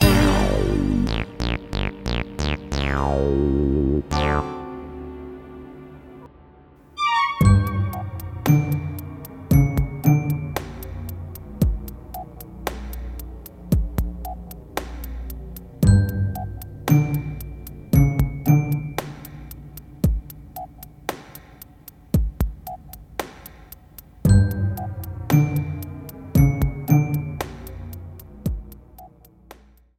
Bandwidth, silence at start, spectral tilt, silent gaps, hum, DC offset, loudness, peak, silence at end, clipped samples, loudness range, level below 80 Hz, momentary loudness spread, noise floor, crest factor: 16.5 kHz; 0 s; -6.5 dB/octave; none; none; under 0.1%; -22 LUFS; -2 dBFS; 0.45 s; under 0.1%; 9 LU; -30 dBFS; 20 LU; -49 dBFS; 20 dB